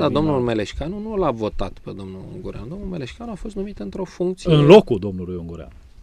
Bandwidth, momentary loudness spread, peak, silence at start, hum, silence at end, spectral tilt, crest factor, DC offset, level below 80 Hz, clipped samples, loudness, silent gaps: 10.5 kHz; 22 LU; 0 dBFS; 0 s; none; 0 s; -7.5 dB/octave; 20 dB; under 0.1%; -38 dBFS; under 0.1%; -19 LUFS; none